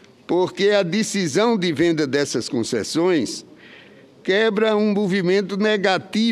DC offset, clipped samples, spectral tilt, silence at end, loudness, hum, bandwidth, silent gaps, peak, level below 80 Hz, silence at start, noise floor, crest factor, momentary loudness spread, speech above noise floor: under 0.1%; under 0.1%; -4.5 dB/octave; 0 s; -20 LUFS; none; 13.5 kHz; none; -6 dBFS; -64 dBFS; 0.3 s; -46 dBFS; 14 dB; 5 LU; 27 dB